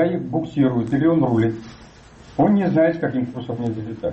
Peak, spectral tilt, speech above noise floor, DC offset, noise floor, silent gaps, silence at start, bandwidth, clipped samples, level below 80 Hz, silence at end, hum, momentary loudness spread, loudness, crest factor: -8 dBFS; -9 dB/octave; 25 dB; under 0.1%; -44 dBFS; none; 0 s; 8.2 kHz; under 0.1%; -50 dBFS; 0 s; none; 10 LU; -20 LUFS; 12 dB